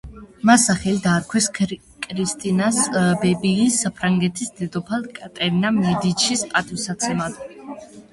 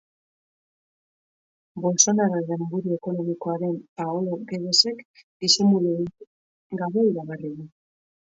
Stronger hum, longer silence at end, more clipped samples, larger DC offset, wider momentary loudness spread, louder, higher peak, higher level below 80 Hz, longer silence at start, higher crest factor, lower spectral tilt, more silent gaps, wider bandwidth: neither; second, 0.1 s vs 0.7 s; neither; neither; second, 12 LU vs 16 LU; first, -20 LUFS vs -23 LUFS; about the same, -2 dBFS vs -2 dBFS; first, -50 dBFS vs -70 dBFS; second, 0.05 s vs 1.75 s; about the same, 20 dB vs 24 dB; about the same, -4 dB/octave vs -3.5 dB/octave; second, none vs 3.88-3.96 s, 5.05-5.14 s, 5.23-5.40 s, 6.27-6.70 s; first, 11.5 kHz vs 7.8 kHz